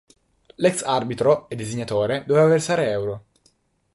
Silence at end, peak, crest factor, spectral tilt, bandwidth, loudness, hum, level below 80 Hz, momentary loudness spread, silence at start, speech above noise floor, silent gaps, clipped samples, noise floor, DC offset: 0.75 s; -4 dBFS; 18 dB; -5.5 dB/octave; 11.5 kHz; -21 LUFS; none; -58 dBFS; 12 LU; 0.6 s; 43 dB; none; under 0.1%; -63 dBFS; under 0.1%